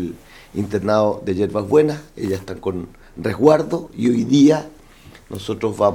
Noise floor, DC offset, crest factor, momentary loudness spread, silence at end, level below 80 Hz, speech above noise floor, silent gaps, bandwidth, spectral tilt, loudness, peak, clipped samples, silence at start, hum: -44 dBFS; under 0.1%; 18 dB; 17 LU; 0 s; -48 dBFS; 26 dB; none; 15 kHz; -7 dB/octave; -19 LUFS; 0 dBFS; under 0.1%; 0 s; none